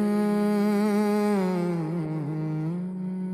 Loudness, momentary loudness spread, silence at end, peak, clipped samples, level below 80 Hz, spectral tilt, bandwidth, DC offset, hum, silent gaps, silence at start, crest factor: -26 LUFS; 7 LU; 0 s; -16 dBFS; under 0.1%; -66 dBFS; -8 dB/octave; 14.5 kHz; under 0.1%; none; none; 0 s; 10 dB